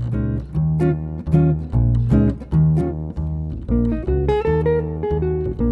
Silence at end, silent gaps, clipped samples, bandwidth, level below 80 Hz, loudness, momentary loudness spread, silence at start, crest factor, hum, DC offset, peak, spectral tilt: 0 s; none; under 0.1%; 4.3 kHz; -26 dBFS; -20 LUFS; 8 LU; 0 s; 16 dB; none; under 0.1%; -2 dBFS; -11 dB/octave